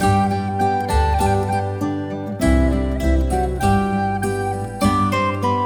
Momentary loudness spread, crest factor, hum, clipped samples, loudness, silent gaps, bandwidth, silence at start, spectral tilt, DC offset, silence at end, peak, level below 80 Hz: 6 LU; 16 dB; none; under 0.1%; -19 LUFS; none; 19 kHz; 0 s; -6.5 dB/octave; under 0.1%; 0 s; -4 dBFS; -26 dBFS